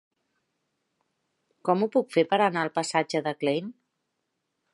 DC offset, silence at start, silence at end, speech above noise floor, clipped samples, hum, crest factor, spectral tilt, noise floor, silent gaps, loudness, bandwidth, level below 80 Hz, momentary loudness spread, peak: under 0.1%; 1.65 s; 1 s; 55 dB; under 0.1%; none; 22 dB; -5 dB/octave; -80 dBFS; none; -26 LUFS; 11.5 kHz; -82 dBFS; 8 LU; -8 dBFS